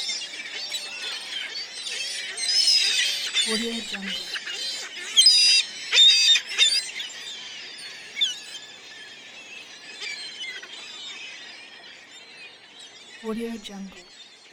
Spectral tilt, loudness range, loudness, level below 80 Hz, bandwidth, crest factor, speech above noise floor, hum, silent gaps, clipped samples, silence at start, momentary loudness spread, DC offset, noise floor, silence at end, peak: 1 dB/octave; 19 LU; -20 LUFS; -68 dBFS; 20 kHz; 20 dB; 16 dB; none; none; under 0.1%; 0 s; 25 LU; under 0.1%; -46 dBFS; 0.05 s; -6 dBFS